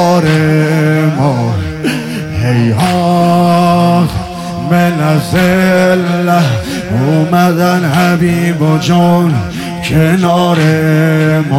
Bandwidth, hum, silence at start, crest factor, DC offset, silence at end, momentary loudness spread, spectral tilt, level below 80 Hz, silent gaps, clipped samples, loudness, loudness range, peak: 16 kHz; none; 0 s; 10 dB; under 0.1%; 0 s; 7 LU; -6.5 dB/octave; -36 dBFS; none; under 0.1%; -11 LUFS; 1 LU; 0 dBFS